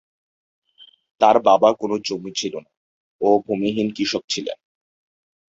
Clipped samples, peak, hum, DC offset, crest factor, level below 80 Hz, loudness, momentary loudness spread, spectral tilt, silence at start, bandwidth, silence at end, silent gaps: under 0.1%; -2 dBFS; none; under 0.1%; 20 dB; -64 dBFS; -20 LUFS; 14 LU; -4 dB/octave; 1.2 s; 7.8 kHz; 0.95 s; 2.77-3.19 s, 4.24-4.28 s